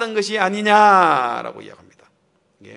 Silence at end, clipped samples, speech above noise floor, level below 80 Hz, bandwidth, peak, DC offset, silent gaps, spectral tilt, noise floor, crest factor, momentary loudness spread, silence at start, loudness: 0 s; under 0.1%; 46 dB; -74 dBFS; 11 kHz; 0 dBFS; under 0.1%; none; -4 dB/octave; -63 dBFS; 18 dB; 15 LU; 0 s; -15 LUFS